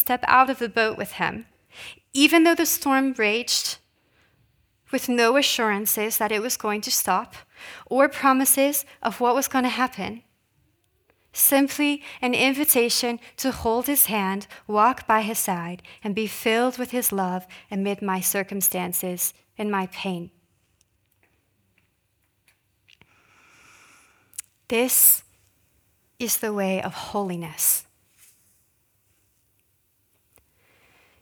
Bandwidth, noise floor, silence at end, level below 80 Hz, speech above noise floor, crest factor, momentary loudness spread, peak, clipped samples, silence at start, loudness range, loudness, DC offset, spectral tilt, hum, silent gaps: over 20 kHz; -70 dBFS; 3.4 s; -60 dBFS; 47 dB; 24 dB; 16 LU; -2 dBFS; under 0.1%; 0 s; 7 LU; -22 LUFS; under 0.1%; -2.5 dB/octave; none; none